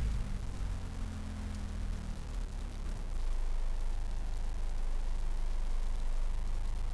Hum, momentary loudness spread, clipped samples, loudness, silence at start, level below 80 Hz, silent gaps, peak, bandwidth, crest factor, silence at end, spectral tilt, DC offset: none; 3 LU; under 0.1%; -41 LUFS; 0 s; -34 dBFS; none; -24 dBFS; 11 kHz; 8 dB; 0 s; -6 dB/octave; under 0.1%